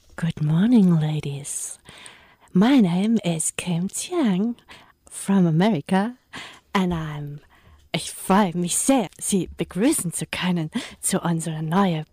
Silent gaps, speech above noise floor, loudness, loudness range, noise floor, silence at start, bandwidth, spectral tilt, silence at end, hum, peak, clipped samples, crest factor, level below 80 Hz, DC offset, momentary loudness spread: none; 26 dB; -22 LUFS; 3 LU; -48 dBFS; 0.2 s; 15.5 kHz; -5 dB/octave; 0.1 s; none; -10 dBFS; under 0.1%; 14 dB; -52 dBFS; under 0.1%; 15 LU